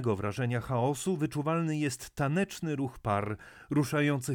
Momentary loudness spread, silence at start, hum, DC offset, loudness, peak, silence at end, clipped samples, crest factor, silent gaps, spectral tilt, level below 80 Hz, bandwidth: 5 LU; 0 s; none; under 0.1%; -31 LUFS; -16 dBFS; 0 s; under 0.1%; 16 dB; none; -6 dB/octave; -58 dBFS; 18.5 kHz